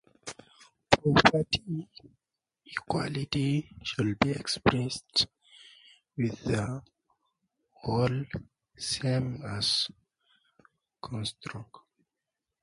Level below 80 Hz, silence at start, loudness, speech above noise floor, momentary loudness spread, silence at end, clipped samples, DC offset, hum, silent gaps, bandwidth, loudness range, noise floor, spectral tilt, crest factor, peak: -54 dBFS; 0.25 s; -29 LUFS; 58 dB; 18 LU; 1 s; under 0.1%; under 0.1%; none; none; 11.5 kHz; 6 LU; -87 dBFS; -5 dB/octave; 32 dB; 0 dBFS